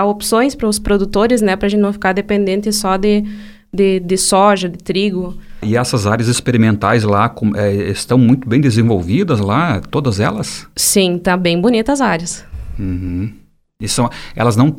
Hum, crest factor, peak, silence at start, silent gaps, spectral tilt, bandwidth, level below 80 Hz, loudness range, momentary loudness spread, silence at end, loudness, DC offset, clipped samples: none; 14 dB; 0 dBFS; 0 s; none; -5 dB/octave; 17 kHz; -34 dBFS; 2 LU; 11 LU; 0 s; -14 LUFS; under 0.1%; under 0.1%